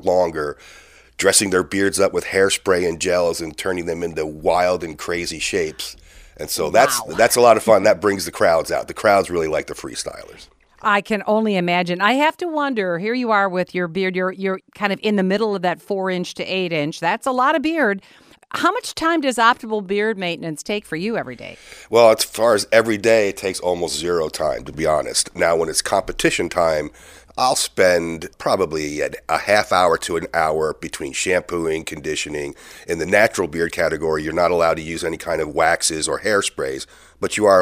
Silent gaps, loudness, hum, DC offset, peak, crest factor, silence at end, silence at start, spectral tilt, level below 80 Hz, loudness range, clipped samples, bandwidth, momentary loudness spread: none; -19 LUFS; none; under 0.1%; 0 dBFS; 20 dB; 0 s; 0 s; -3.5 dB/octave; -48 dBFS; 4 LU; under 0.1%; 16 kHz; 10 LU